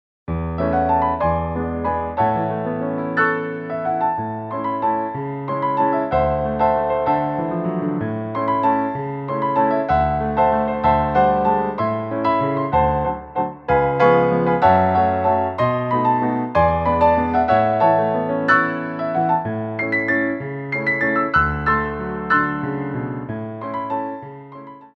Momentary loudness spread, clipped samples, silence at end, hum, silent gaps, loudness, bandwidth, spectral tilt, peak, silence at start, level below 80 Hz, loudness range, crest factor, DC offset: 9 LU; under 0.1%; 0.1 s; none; none; -19 LUFS; 6.6 kHz; -9 dB/octave; -2 dBFS; 0.3 s; -38 dBFS; 4 LU; 18 dB; under 0.1%